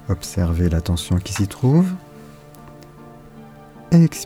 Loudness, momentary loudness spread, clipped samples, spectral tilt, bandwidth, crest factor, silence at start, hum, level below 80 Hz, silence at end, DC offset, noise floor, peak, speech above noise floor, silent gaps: -19 LUFS; 14 LU; under 0.1%; -6.5 dB/octave; 15.5 kHz; 16 dB; 0.05 s; none; -34 dBFS; 0 s; under 0.1%; -42 dBFS; -4 dBFS; 24 dB; none